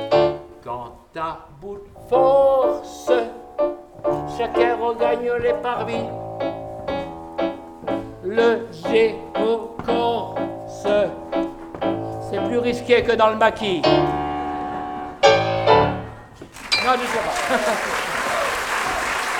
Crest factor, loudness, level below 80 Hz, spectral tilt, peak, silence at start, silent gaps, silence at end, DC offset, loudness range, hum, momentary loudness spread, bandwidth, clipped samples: 20 dB; -21 LUFS; -46 dBFS; -4.5 dB/octave; 0 dBFS; 0 s; none; 0 s; under 0.1%; 5 LU; none; 14 LU; 18 kHz; under 0.1%